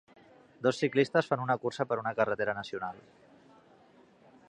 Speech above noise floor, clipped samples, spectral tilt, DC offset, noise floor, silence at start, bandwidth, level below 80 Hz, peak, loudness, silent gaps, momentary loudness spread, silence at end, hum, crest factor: 30 dB; under 0.1%; -6 dB/octave; under 0.1%; -60 dBFS; 0.6 s; 10 kHz; -72 dBFS; -12 dBFS; -31 LUFS; none; 11 LU; 1.5 s; none; 22 dB